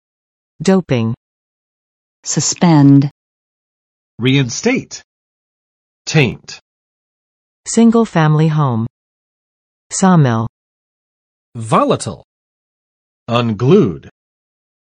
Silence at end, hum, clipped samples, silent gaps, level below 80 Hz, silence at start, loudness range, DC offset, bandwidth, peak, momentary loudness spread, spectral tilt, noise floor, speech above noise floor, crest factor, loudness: 0.85 s; none; under 0.1%; 1.17-2.23 s, 3.11-4.18 s, 5.04-6.05 s, 6.62-7.64 s, 8.90-9.90 s, 10.49-11.52 s, 12.24-13.26 s; -52 dBFS; 0.6 s; 5 LU; under 0.1%; 10 kHz; 0 dBFS; 18 LU; -5.5 dB/octave; under -90 dBFS; over 78 dB; 16 dB; -14 LUFS